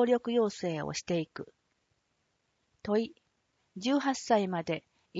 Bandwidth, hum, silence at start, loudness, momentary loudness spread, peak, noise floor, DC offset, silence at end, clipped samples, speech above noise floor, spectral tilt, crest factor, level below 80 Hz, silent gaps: 8 kHz; none; 0 s; -32 LUFS; 15 LU; -14 dBFS; -78 dBFS; under 0.1%; 0 s; under 0.1%; 47 dB; -5 dB/octave; 18 dB; -72 dBFS; none